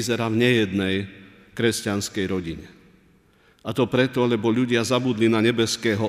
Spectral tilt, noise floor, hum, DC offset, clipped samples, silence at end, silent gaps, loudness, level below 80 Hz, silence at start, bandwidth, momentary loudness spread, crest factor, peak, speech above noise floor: -5 dB/octave; -58 dBFS; none; under 0.1%; under 0.1%; 0 s; none; -22 LUFS; -56 dBFS; 0 s; 15.5 kHz; 12 LU; 18 dB; -6 dBFS; 36 dB